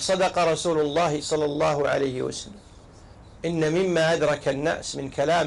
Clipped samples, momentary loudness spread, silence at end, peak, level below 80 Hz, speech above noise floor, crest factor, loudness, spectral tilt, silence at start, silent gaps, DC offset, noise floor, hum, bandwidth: under 0.1%; 9 LU; 0 s; -14 dBFS; -52 dBFS; 24 dB; 10 dB; -24 LUFS; -4.5 dB/octave; 0 s; none; under 0.1%; -47 dBFS; none; 11.5 kHz